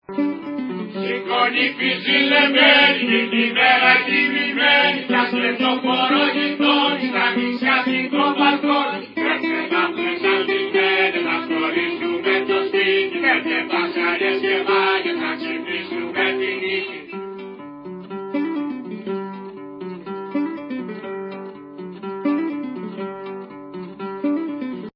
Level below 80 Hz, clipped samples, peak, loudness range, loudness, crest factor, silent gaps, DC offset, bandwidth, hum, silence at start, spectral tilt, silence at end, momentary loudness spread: -72 dBFS; under 0.1%; -2 dBFS; 14 LU; -18 LUFS; 18 dB; none; under 0.1%; 5.6 kHz; none; 0.1 s; -6.5 dB/octave; 0.05 s; 18 LU